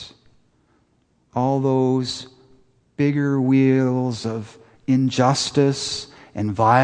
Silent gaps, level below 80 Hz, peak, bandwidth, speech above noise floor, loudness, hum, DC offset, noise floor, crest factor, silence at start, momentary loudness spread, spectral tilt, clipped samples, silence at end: none; -60 dBFS; -2 dBFS; 9.8 kHz; 44 dB; -20 LUFS; none; under 0.1%; -63 dBFS; 20 dB; 0 s; 15 LU; -6 dB/octave; under 0.1%; 0 s